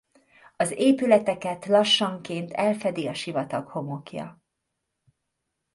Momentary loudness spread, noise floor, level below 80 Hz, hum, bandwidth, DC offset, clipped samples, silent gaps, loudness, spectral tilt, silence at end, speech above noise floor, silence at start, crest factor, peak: 15 LU; -81 dBFS; -70 dBFS; none; 11.5 kHz; under 0.1%; under 0.1%; none; -24 LUFS; -4.5 dB/octave; 1.4 s; 56 dB; 0.6 s; 22 dB; -6 dBFS